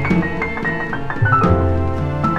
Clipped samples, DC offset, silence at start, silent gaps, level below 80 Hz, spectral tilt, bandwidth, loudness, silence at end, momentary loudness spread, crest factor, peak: under 0.1%; under 0.1%; 0 s; none; -32 dBFS; -8.5 dB/octave; 7.6 kHz; -18 LUFS; 0 s; 7 LU; 16 dB; 0 dBFS